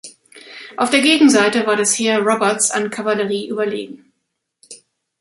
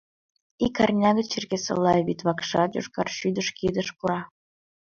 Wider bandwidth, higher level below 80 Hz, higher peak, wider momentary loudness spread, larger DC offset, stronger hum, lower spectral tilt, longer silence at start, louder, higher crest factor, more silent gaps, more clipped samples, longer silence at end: first, 11.5 kHz vs 7.4 kHz; second, -66 dBFS vs -56 dBFS; first, -2 dBFS vs -8 dBFS; first, 18 LU vs 7 LU; neither; neither; second, -2.5 dB/octave vs -5 dB/octave; second, 0.05 s vs 0.6 s; first, -16 LUFS vs -25 LUFS; about the same, 16 dB vs 18 dB; neither; neither; second, 0.45 s vs 0.6 s